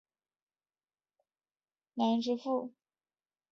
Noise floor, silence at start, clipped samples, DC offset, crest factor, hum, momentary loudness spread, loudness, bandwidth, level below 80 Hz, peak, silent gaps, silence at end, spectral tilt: under -90 dBFS; 1.95 s; under 0.1%; under 0.1%; 20 dB; none; 15 LU; -33 LUFS; 6.8 kHz; -86 dBFS; -18 dBFS; none; 0.8 s; -6 dB/octave